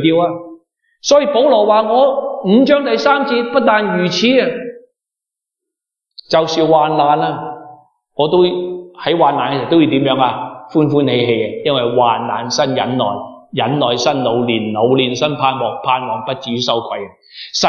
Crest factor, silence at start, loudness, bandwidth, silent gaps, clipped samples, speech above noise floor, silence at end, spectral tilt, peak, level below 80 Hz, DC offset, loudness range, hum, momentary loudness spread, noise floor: 14 dB; 0 s; -14 LUFS; 7.2 kHz; none; under 0.1%; 71 dB; 0 s; -5 dB/octave; 0 dBFS; -62 dBFS; under 0.1%; 4 LU; none; 11 LU; -84 dBFS